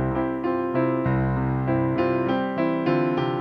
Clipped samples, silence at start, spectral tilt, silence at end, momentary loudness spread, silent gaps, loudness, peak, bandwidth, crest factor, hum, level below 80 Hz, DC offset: under 0.1%; 0 s; -10 dB/octave; 0 s; 3 LU; none; -24 LUFS; -8 dBFS; 5.6 kHz; 14 dB; none; -42 dBFS; under 0.1%